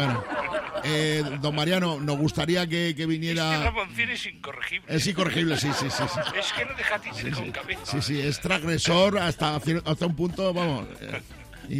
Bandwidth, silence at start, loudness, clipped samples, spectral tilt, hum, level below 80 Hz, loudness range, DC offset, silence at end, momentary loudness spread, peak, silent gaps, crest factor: 16 kHz; 0 s; -26 LUFS; under 0.1%; -4.5 dB/octave; none; -48 dBFS; 2 LU; under 0.1%; 0 s; 8 LU; -10 dBFS; none; 18 dB